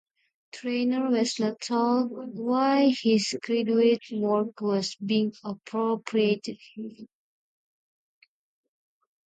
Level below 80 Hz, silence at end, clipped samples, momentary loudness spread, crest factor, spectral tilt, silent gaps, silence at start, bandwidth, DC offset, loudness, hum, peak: -78 dBFS; 2.2 s; under 0.1%; 15 LU; 16 dB; -5 dB/octave; none; 0.55 s; 9.2 kHz; under 0.1%; -26 LUFS; none; -10 dBFS